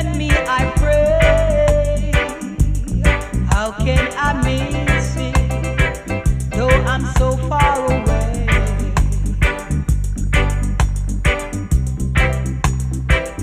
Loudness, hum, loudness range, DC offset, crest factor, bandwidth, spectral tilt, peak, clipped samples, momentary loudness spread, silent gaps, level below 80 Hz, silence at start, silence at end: -18 LUFS; none; 3 LU; under 0.1%; 16 dB; 15 kHz; -5.5 dB/octave; 0 dBFS; under 0.1%; 5 LU; none; -20 dBFS; 0 s; 0 s